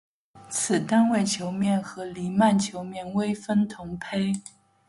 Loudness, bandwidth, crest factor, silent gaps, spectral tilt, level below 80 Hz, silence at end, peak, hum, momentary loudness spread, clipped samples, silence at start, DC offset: -25 LUFS; 11.5 kHz; 16 dB; none; -5 dB/octave; -62 dBFS; 0.4 s; -10 dBFS; none; 12 LU; under 0.1%; 0.35 s; under 0.1%